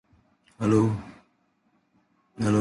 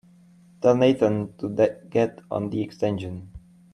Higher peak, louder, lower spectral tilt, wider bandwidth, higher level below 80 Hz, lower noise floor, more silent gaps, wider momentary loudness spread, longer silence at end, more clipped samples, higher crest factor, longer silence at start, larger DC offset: about the same, -8 dBFS vs -6 dBFS; about the same, -25 LUFS vs -24 LUFS; about the same, -7.5 dB/octave vs -7.5 dB/octave; about the same, 11.5 kHz vs 10.5 kHz; about the same, -56 dBFS vs -56 dBFS; first, -69 dBFS vs -53 dBFS; neither; first, 14 LU vs 11 LU; second, 0 s vs 0.35 s; neither; about the same, 20 dB vs 20 dB; about the same, 0.6 s vs 0.6 s; neither